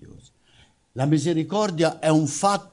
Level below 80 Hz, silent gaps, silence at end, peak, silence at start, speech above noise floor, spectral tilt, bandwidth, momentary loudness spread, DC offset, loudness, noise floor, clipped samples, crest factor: -64 dBFS; none; 0.1 s; -6 dBFS; 0 s; 36 dB; -5.5 dB/octave; 11 kHz; 5 LU; under 0.1%; -22 LUFS; -58 dBFS; under 0.1%; 16 dB